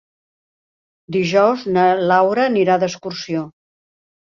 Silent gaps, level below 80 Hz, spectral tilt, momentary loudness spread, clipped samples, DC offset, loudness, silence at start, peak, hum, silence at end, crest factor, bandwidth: none; -62 dBFS; -5.5 dB/octave; 11 LU; under 0.1%; under 0.1%; -17 LUFS; 1.1 s; -2 dBFS; none; 0.8 s; 16 dB; 7.4 kHz